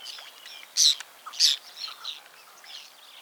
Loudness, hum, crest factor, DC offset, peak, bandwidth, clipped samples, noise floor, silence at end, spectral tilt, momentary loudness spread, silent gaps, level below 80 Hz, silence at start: -23 LUFS; none; 24 dB; under 0.1%; -6 dBFS; over 20 kHz; under 0.1%; -50 dBFS; 0.4 s; 6 dB/octave; 23 LU; none; under -90 dBFS; 0 s